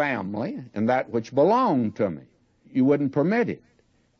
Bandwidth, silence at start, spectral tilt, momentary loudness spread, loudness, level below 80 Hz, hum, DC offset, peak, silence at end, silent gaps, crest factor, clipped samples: 6.6 kHz; 0 s; -8 dB/octave; 11 LU; -24 LUFS; -68 dBFS; none; under 0.1%; -8 dBFS; 0.65 s; none; 16 dB; under 0.1%